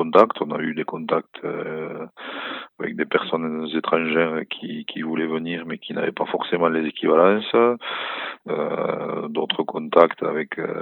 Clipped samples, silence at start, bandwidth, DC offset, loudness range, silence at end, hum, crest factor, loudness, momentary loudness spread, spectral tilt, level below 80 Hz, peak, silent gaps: under 0.1%; 0 s; 5 kHz; under 0.1%; 4 LU; 0 s; none; 22 dB; -23 LUFS; 13 LU; -7.5 dB/octave; -74 dBFS; 0 dBFS; none